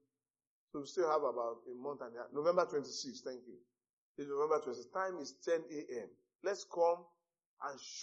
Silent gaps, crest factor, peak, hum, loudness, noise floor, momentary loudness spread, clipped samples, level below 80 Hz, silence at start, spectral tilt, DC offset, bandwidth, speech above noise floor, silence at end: 3.89-4.15 s, 6.35-6.39 s, 7.46-7.57 s; 22 dB; -18 dBFS; none; -39 LUFS; under -90 dBFS; 14 LU; under 0.1%; under -90 dBFS; 0.75 s; -3 dB/octave; under 0.1%; 8 kHz; over 51 dB; 0 s